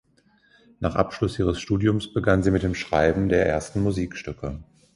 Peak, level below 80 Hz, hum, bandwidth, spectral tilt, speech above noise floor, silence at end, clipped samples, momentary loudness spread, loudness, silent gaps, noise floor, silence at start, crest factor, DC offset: -4 dBFS; -40 dBFS; none; 11.5 kHz; -7 dB/octave; 38 dB; 0.3 s; under 0.1%; 12 LU; -24 LUFS; none; -61 dBFS; 0.8 s; 20 dB; under 0.1%